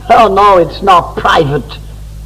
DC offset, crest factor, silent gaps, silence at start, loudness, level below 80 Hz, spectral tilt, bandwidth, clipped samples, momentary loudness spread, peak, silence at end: under 0.1%; 10 dB; none; 0 s; -8 LUFS; -28 dBFS; -5.5 dB/octave; 15.5 kHz; 0.2%; 15 LU; 0 dBFS; 0 s